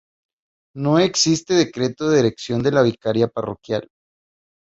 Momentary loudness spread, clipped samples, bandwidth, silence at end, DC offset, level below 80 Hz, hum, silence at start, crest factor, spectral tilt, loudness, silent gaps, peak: 10 LU; under 0.1%; 8 kHz; 0.95 s; under 0.1%; -56 dBFS; none; 0.75 s; 18 dB; -4.5 dB/octave; -19 LUFS; none; -2 dBFS